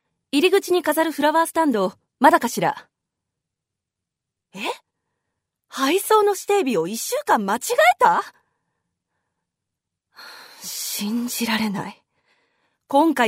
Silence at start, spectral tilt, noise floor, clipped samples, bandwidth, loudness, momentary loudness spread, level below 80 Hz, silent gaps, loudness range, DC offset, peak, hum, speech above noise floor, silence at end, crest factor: 0.35 s; -3.5 dB/octave; -84 dBFS; under 0.1%; 16 kHz; -20 LUFS; 18 LU; -72 dBFS; none; 10 LU; under 0.1%; -2 dBFS; none; 65 dB; 0 s; 20 dB